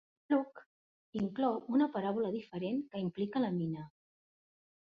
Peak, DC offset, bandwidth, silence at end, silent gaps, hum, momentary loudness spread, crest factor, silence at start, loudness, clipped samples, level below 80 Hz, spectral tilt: -20 dBFS; under 0.1%; 5.4 kHz; 1 s; 0.66-1.13 s; none; 11 LU; 16 dB; 0.3 s; -35 LUFS; under 0.1%; -76 dBFS; -6.5 dB/octave